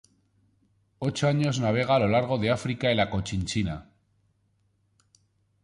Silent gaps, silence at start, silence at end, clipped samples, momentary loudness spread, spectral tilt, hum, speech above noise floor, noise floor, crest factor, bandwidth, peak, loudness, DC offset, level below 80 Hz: none; 1 s; 1.8 s; under 0.1%; 9 LU; -6 dB/octave; none; 44 dB; -70 dBFS; 18 dB; 11.5 kHz; -10 dBFS; -26 LUFS; under 0.1%; -50 dBFS